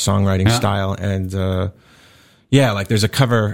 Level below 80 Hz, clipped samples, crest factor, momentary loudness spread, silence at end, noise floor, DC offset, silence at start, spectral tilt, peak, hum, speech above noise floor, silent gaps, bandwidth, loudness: -44 dBFS; under 0.1%; 18 dB; 6 LU; 0 s; -50 dBFS; 0.6%; 0 s; -5.5 dB/octave; 0 dBFS; none; 33 dB; none; 16.5 kHz; -18 LUFS